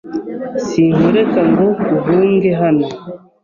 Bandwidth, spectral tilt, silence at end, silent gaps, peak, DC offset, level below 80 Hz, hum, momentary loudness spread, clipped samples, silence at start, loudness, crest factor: 7.4 kHz; -8 dB/octave; 0.25 s; none; -2 dBFS; under 0.1%; -50 dBFS; none; 11 LU; under 0.1%; 0.05 s; -14 LUFS; 12 dB